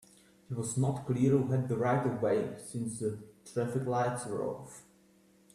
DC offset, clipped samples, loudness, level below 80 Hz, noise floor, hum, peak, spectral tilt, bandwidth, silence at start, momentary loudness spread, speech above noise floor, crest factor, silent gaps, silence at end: under 0.1%; under 0.1%; -33 LUFS; -66 dBFS; -64 dBFS; none; -16 dBFS; -7 dB/octave; 13.5 kHz; 0.5 s; 12 LU; 32 dB; 18 dB; none; 0.75 s